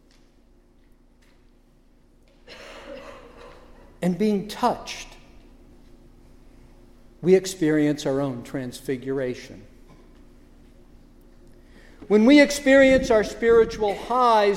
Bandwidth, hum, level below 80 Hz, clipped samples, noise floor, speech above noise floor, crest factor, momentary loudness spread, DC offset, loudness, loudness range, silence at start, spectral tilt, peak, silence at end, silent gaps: 15.5 kHz; none; -48 dBFS; under 0.1%; -56 dBFS; 36 dB; 20 dB; 25 LU; under 0.1%; -21 LUFS; 14 LU; 2.5 s; -5.5 dB/octave; -4 dBFS; 0 s; none